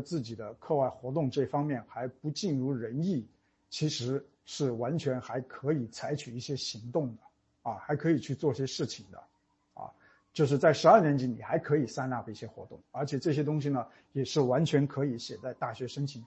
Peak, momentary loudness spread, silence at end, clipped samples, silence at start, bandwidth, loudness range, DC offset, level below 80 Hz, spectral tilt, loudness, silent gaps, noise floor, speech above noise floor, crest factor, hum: -8 dBFS; 15 LU; 0 s; under 0.1%; 0 s; 8.4 kHz; 7 LU; under 0.1%; -70 dBFS; -6.5 dB/octave; -31 LUFS; none; -57 dBFS; 26 dB; 24 dB; none